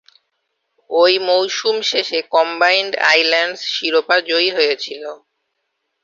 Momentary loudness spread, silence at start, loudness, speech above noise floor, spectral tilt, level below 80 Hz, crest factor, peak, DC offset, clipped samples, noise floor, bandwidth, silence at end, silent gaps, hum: 8 LU; 0.9 s; -15 LUFS; 56 dB; -1 dB/octave; -70 dBFS; 16 dB; 0 dBFS; under 0.1%; under 0.1%; -73 dBFS; 7.8 kHz; 0.9 s; none; none